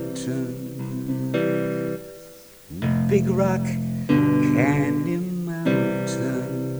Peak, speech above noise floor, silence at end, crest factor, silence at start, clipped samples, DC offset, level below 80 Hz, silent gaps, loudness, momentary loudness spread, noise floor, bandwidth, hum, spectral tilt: -6 dBFS; 23 dB; 0 s; 16 dB; 0 s; under 0.1%; under 0.1%; -52 dBFS; none; -23 LUFS; 12 LU; -45 dBFS; over 20 kHz; none; -7.5 dB/octave